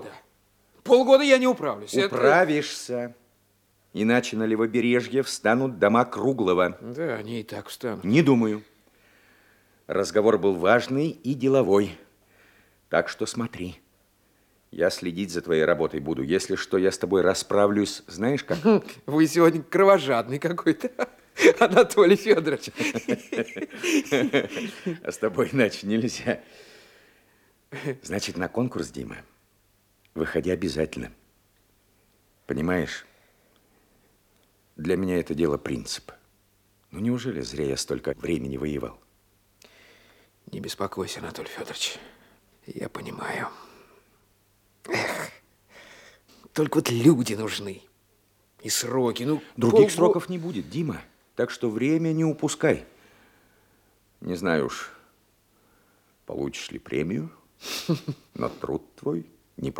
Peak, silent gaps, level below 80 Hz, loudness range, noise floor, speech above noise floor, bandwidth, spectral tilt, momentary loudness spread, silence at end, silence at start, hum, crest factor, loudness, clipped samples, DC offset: -2 dBFS; none; -58 dBFS; 12 LU; -65 dBFS; 41 dB; 17 kHz; -5 dB/octave; 16 LU; 0 s; 0 s; none; 24 dB; -24 LUFS; under 0.1%; under 0.1%